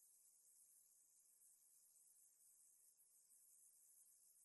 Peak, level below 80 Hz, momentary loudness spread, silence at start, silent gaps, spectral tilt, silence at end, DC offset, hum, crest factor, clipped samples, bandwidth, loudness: -54 dBFS; under -90 dBFS; 1 LU; 0 s; none; 2 dB/octave; 0 s; under 0.1%; none; 18 dB; under 0.1%; 12 kHz; -69 LUFS